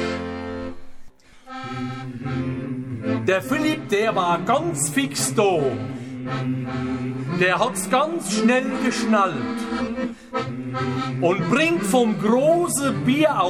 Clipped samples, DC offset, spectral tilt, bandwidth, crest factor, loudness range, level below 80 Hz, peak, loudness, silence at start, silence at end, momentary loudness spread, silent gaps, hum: under 0.1%; 0.2%; -4.5 dB/octave; 17 kHz; 18 dB; 4 LU; -52 dBFS; -4 dBFS; -22 LUFS; 0 s; 0 s; 11 LU; none; none